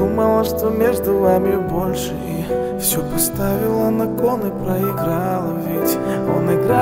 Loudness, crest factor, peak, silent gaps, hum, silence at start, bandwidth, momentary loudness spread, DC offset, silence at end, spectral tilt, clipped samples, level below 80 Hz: -18 LUFS; 16 dB; -2 dBFS; none; none; 0 s; 16.5 kHz; 6 LU; under 0.1%; 0 s; -5.5 dB/octave; under 0.1%; -38 dBFS